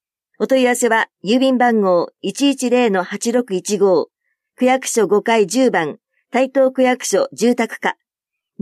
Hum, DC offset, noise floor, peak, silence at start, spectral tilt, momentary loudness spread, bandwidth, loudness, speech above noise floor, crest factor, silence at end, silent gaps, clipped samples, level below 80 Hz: none; under 0.1%; -83 dBFS; -4 dBFS; 0.4 s; -4 dB/octave; 7 LU; 14.5 kHz; -17 LUFS; 67 dB; 14 dB; 0.7 s; none; under 0.1%; -72 dBFS